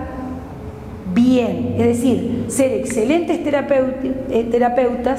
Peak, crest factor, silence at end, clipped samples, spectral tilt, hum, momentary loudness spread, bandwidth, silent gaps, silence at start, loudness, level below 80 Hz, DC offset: -4 dBFS; 14 dB; 0 s; under 0.1%; -6 dB/octave; none; 14 LU; 15 kHz; none; 0 s; -18 LUFS; -40 dBFS; 0.1%